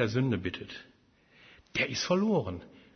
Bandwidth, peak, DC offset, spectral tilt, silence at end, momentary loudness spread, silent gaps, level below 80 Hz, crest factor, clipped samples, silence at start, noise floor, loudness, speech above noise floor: 6.6 kHz; -14 dBFS; under 0.1%; -5.5 dB/octave; 0.25 s; 17 LU; none; -60 dBFS; 18 dB; under 0.1%; 0 s; -62 dBFS; -31 LUFS; 32 dB